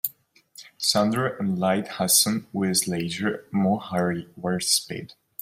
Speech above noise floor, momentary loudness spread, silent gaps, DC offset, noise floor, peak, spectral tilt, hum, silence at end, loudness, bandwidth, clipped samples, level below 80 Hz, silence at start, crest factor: 31 dB; 11 LU; none; under 0.1%; -55 dBFS; -4 dBFS; -3.5 dB/octave; none; 0.35 s; -23 LUFS; 16 kHz; under 0.1%; -64 dBFS; 0.05 s; 22 dB